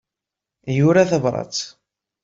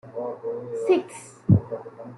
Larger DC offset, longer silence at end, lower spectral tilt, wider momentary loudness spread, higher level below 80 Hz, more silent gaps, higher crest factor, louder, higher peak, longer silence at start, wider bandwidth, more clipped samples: neither; first, 0.55 s vs 0 s; second, -6 dB/octave vs -8.5 dB/octave; about the same, 17 LU vs 15 LU; about the same, -58 dBFS vs -56 dBFS; neither; about the same, 18 dB vs 22 dB; first, -19 LUFS vs -25 LUFS; about the same, -4 dBFS vs -4 dBFS; first, 0.65 s vs 0.05 s; second, 7.8 kHz vs 11.5 kHz; neither